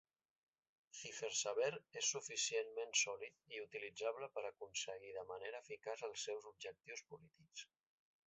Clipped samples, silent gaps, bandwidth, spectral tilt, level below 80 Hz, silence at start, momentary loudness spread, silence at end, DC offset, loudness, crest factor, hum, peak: under 0.1%; none; 8.2 kHz; 0 dB/octave; -90 dBFS; 0.95 s; 16 LU; 0.6 s; under 0.1%; -44 LUFS; 24 dB; none; -24 dBFS